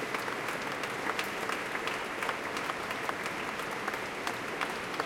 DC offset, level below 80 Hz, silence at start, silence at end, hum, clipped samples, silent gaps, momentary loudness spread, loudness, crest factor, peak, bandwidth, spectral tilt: under 0.1%; -66 dBFS; 0 s; 0 s; none; under 0.1%; none; 2 LU; -34 LUFS; 20 dB; -14 dBFS; 17 kHz; -3 dB/octave